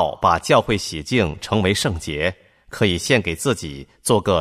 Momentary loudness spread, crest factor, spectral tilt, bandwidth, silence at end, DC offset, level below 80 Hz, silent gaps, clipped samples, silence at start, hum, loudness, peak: 8 LU; 18 dB; -4.5 dB/octave; 15 kHz; 0 s; under 0.1%; -42 dBFS; none; under 0.1%; 0 s; none; -20 LUFS; -2 dBFS